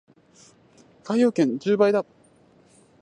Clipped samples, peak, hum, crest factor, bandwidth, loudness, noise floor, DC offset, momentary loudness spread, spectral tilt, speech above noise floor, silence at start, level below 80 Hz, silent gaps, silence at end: under 0.1%; -6 dBFS; none; 18 dB; 10.5 kHz; -22 LUFS; -57 dBFS; under 0.1%; 16 LU; -6.5 dB/octave; 36 dB; 1.05 s; -74 dBFS; none; 1 s